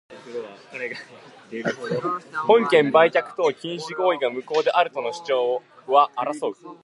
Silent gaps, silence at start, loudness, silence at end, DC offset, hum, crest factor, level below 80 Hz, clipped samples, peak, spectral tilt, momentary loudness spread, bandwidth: none; 0.1 s; -22 LUFS; 0.1 s; under 0.1%; none; 20 dB; -78 dBFS; under 0.1%; -2 dBFS; -5 dB/octave; 17 LU; 11.5 kHz